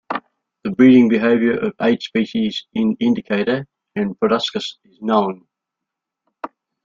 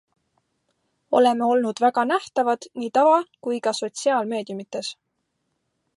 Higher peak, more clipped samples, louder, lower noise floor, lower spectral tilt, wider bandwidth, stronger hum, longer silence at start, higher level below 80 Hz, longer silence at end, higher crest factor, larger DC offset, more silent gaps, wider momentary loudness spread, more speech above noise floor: first, -2 dBFS vs -6 dBFS; neither; first, -18 LUFS vs -22 LUFS; first, -82 dBFS vs -75 dBFS; first, -6.5 dB/octave vs -3.5 dB/octave; second, 7.4 kHz vs 11.5 kHz; neither; second, 0.1 s vs 1.1 s; first, -60 dBFS vs -78 dBFS; second, 0.4 s vs 1.05 s; about the same, 16 dB vs 18 dB; neither; neither; first, 18 LU vs 12 LU; first, 66 dB vs 54 dB